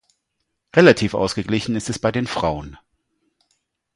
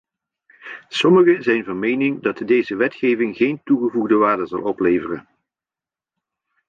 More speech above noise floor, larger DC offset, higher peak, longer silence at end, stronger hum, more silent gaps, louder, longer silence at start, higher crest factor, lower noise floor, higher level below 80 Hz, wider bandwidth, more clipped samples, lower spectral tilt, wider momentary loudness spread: second, 57 dB vs over 72 dB; neither; first, 0 dBFS vs -4 dBFS; second, 1.2 s vs 1.5 s; neither; neither; about the same, -19 LUFS vs -18 LUFS; about the same, 0.75 s vs 0.65 s; first, 22 dB vs 16 dB; second, -75 dBFS vs under -90 dBFS; first, -46 dBFS vs -62 dBFS; first, 11.5 kHz vs 7.6 kHz; neither; about the same, -5.5 dB/octave vs -6.5 dB/octave; about the same, 11 LU vs 11 LU